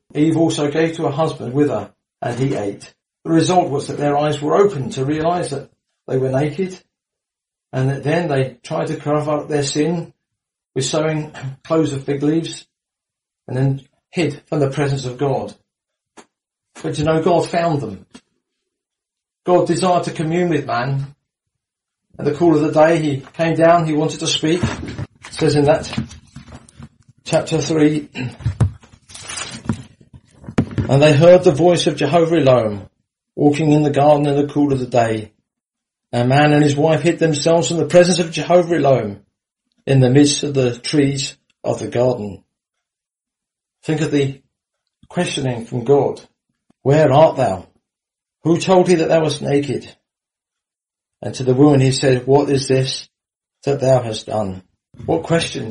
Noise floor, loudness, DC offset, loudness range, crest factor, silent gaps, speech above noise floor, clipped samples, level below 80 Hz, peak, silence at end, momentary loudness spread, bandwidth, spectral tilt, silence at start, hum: -87 dBFS; -17 LUFS; under 0.1%; 7 LU; 18 dB; none; 71 dB; under 0.1%; -46 dBFS; 0 dBFS; 0 s; 14 LU; 11.5 kHz; -6 dB/octave; 0.15 s; none